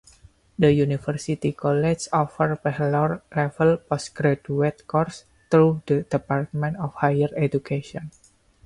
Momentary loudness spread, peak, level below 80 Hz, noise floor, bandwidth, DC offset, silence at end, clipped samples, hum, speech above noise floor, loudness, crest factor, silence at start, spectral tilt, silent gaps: 10 LU; -6 dBFS; -54 dBFS; -53 dBFS; 11.5 kHz; under 0.1%; 0.55 s; under 0.1%; none; 31 dB; -23 LUFS; 18 dB; 0.6 s; -7 dB/octave; none